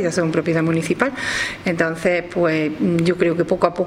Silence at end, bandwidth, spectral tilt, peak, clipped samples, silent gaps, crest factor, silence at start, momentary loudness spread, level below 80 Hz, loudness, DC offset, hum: 0 s; 14 kHz; -6 dB/octave; 0 dBFS; under 0.1%; none; 18 dB; 0 s; 3 LU; -50 dBFS; -19 LUFS; under 0.1%; none